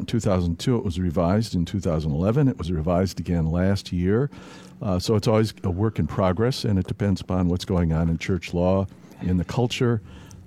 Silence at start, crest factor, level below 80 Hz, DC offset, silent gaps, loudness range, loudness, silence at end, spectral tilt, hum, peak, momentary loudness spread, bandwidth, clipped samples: 0 s; 16 dB; -40 dBFS; under 0.1%; none; 1 LU; -24 LUFS; 0 s; -7 dB/octave; none; -6 dBFS; 4 LU; 14 kHz; under 0.1%